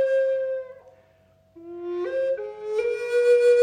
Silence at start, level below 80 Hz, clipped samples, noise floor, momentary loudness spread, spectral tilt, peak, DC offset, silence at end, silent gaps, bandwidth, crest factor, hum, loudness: 0 s; -70 dBFS; under 0.1%; -59 dBFS; 16 LU; -3.5 dB/octave; -10 dBFS; under 0.1%; 0 s; none; 9.8 kHz; 14 dB; none; -24 LUFS